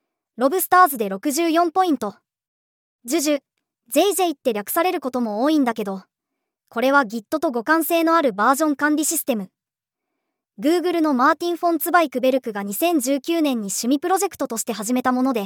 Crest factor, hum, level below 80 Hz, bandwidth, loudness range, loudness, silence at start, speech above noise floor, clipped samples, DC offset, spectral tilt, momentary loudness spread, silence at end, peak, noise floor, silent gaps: 18 dB; none; -76 dBFS; over 20 kHz; 3 LU; -20 LUFS; 0.4 s; 67 dB; under 0.1%; under 0.1%; -3 dB/octave; 8 LU; 0 s; -2 dBFS; -87 dBFS; 2.48-2.99 s